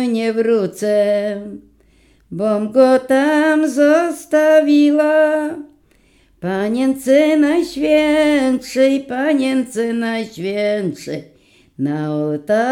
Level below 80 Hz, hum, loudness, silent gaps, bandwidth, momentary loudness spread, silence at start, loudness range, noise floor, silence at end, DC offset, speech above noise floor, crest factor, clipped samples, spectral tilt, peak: -56 dBFS; none; -16 LUFS; none; 14 kHz; 12 LU; 0 s; 5 LU; -54 dBFS; 0 s; under 0.1%; 38 dB; 16 dB; under 0.1%; -5.5 dB/octave; 0 dBFS